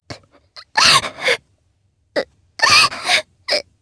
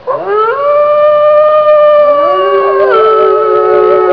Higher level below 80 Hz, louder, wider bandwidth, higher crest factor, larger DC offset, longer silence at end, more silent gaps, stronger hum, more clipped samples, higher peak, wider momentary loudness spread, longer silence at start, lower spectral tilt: about the same, -54 dBFS vs -52 dBFS; second, -15 LUFS vs -7 LUFS; first, 11 kHz vs 5.4 kHz; first, 18 dB vs 6 dB; second, under 0.1% vs 0.5%; first, 0.2 s vs 0 s; neither; neither; second, under 0.1% vs 0.5%; about the same, 0 dBFS vs 0 dBFS; first, 14 LU vs 4 LU; about the same, 0.1 s vs 0.05 s; second, 0 dB/octave vs -7 dB/octave